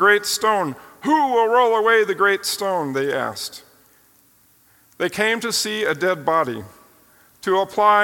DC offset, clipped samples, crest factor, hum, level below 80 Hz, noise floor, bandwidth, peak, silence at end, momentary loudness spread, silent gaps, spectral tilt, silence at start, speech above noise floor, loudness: under 0.1%; under 0.1%; 18 dB; none; -66 dBFS; -56 dBFS; 17.5 kHz; -2 dBFS; 0 s; 11 LU; none; -3 dB/octave; 0 s; 37 dB; -19 LUFS